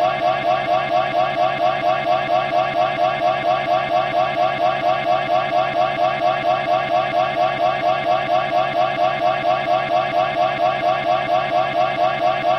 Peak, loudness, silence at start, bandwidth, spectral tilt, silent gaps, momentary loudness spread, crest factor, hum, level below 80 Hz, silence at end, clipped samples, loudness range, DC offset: -6 dBFS; -19 LUFS; 0 s; 8.4 kHz; -5.5 dB/octave; none; 1 LU; 12 dB; none; -54 dBFS; 0 s; under 0.1%; 0 LU; under 0.1%